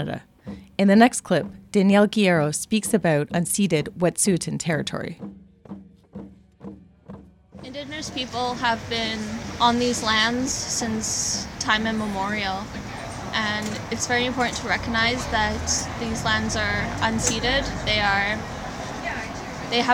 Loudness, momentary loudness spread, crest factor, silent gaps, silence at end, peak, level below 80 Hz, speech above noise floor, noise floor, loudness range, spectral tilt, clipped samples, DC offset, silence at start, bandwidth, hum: -23 LUFS; 17 LU; 22 dB; none; 0 s; -2 dBFS; -44 dBFS; 21 dB; -44 dBFS; 9 LU; -3.5 dB/octave; under 0.1%; under 0.1%; 0 s; 16.5 kHz; none